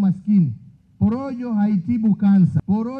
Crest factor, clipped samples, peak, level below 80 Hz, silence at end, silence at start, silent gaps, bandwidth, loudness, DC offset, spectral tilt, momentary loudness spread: 12 dB; under 0.1%; -8 dBFS; -50 dBFS; 0 s; 0 s; none; 4.8 kHz; -19 LUFS; under 0.1%; -11 dB/octave; 9 LU